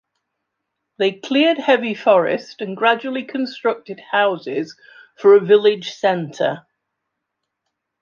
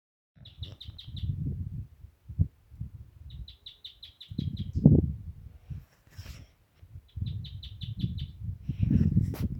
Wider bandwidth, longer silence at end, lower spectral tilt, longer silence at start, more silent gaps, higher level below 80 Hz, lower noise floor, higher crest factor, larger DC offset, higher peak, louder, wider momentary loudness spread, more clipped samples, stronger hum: second, 7.2 kHz vs 16 kHz; first, 1.45 s vs 0 s; second, -5.5 dB/octave vs -9 dB/octave; first, 1 s vs 0.4 s; neither; second, -72 dBFS vs -44 dBFS; first, -78 dBFS vs -57 dBFS; second, 18 dB vs 28 dB; neither; about the same, -2 dBFS vs -4 dBFS; first, -18 LUFS vs -31 LUFS; second, 12 LU vs 23 LU; neither; neither